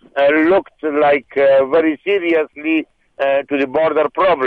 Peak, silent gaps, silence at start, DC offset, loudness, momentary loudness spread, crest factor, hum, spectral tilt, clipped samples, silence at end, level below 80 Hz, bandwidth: -4 dBFS; none; 0.15 s; under 0.1%; -15 LUFS; 6 LU; 10 dB; none; -7 dB/octave; under 0.1%; 0 s; -56 dBFS; 4.8 kHz